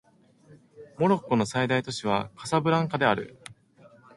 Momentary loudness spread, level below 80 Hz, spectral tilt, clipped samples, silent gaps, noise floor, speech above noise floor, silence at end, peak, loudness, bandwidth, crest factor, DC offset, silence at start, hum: 6 LU; -62 dBFS; -5.5 dB/octave; under 0.1%; none; -57 dBFS; 32 dB; 0.65 s; -6 dBFS; -26 LUFS; 11.5 kHz; 22 dB; under 0.1%; 0.5 s; none